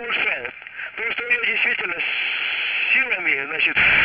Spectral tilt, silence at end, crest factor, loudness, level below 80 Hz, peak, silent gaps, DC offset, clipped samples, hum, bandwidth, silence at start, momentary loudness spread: -5.5 dB/octave; 0 s; 16 dB; -19 LUFS; -54 dBFS; -6 dBFS; none; under 0.1%; under 0.1%; none; 5.8 kHz; 0 s; 10 LU